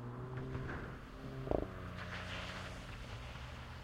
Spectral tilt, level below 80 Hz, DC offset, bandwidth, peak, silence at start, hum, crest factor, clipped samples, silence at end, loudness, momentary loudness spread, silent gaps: -6 dB/octave; -52 dBFS; under 0.1%; 16 kHz; -18 dBFS; 0 s; none; 26 dB; under 0.1%; 0 s; -45 LUFS; 9 LU; none